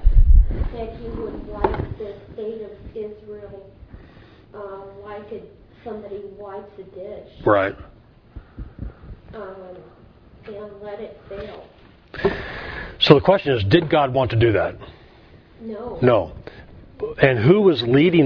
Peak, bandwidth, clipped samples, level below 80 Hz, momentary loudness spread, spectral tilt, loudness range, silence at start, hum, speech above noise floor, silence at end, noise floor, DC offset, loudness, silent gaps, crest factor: 0 dBFS; 5.4 kHz; under 0.1%; -26 dBFS; 24 LU; -8.5 dB/octave; 18 LU; 0 s; none; 27 dB; 0 s; -48 dBFS; under 0.1%; -20 LUFS; none; 22 dB